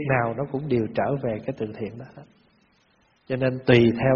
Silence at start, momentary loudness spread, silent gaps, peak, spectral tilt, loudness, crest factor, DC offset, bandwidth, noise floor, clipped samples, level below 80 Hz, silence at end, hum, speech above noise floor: 0 s; 17 LU; none; -2 dBFS; -6 dB/octave; -24 LUFS; 22 dB; under 0.1%; 6.8 kHz; -63 dBFS; under 0.1%; -52 dBFS; 0 s; none; 40 dB